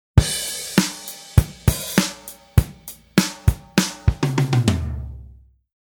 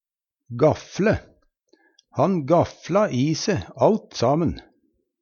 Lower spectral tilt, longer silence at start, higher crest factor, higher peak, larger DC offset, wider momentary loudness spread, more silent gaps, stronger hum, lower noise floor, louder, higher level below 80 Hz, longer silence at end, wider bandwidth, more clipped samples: second, -4.5 dB/octave vs -6.5 dB/octave; second, 0.15 s vs 0.5 s; about the same, 20 dB vs 18 dB; first, 0 dBFS vs -4 dBFS; neither; first, 14 LU vs 7 LU; neither; neither; second, -46 dBFS vs -69 dBFS; about the same, -21 LUFS vs -22 LUFS; first, -28 dBFS vs -48 dBFS; about the same, 0.6 s vs 0.6 s; first, 20 kHz vs 7.2 kHz; neither